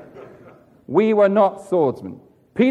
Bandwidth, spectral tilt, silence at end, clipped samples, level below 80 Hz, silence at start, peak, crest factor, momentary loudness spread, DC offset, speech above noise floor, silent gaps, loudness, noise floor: 10.5 kHz; -8 dB/octave; 0 s; under 0.1%; -66 dBFS; 0.15 s; -4 dBFS; 16 dB; 17 LU; under 0.1%; 30 dB; none; -18 LUFS; -48 dBFS